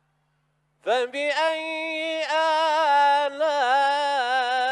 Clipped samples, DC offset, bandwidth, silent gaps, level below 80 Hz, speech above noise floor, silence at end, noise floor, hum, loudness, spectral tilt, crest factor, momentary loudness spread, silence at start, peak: under 0.1%; under 0.1%; 12 kHz; none; -82 dBFS; 45 dB; 0 s; -70 dBFS; none; -22 LUFS; -0.5 dB/octave; 14 dB; 8 LU; 0.85 s; -10 dBFS